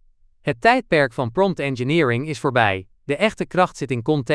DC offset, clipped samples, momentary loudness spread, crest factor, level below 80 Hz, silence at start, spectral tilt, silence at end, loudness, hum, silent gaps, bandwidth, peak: under 0.1%; under 0.1%; 8 LU; 20 dB; -52 dBFS; 0.45 s; -6 dB/octave; 0 s; -20 LUFS; none; none; 11 kHz; 0 dBFS